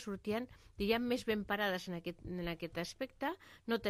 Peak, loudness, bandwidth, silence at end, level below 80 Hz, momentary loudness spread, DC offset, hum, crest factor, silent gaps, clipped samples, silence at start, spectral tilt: -18 dBFS; -39 LUFS; 15.5 kHz; 0 s; -60 dBFS; 9 LU; under 0.1%; none; 20 dB; none; under 0.1%; 0 s; -5 dB/octave